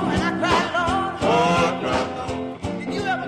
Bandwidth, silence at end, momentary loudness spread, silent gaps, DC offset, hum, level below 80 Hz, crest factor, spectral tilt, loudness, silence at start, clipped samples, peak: 13 kHz; 0 s; 10 LU; none; under 0.1%; none; -42 dBFS; 16 dB; -5 dB/octave; -22 LUFS; 0 s; under 0.1%; -6 dBFS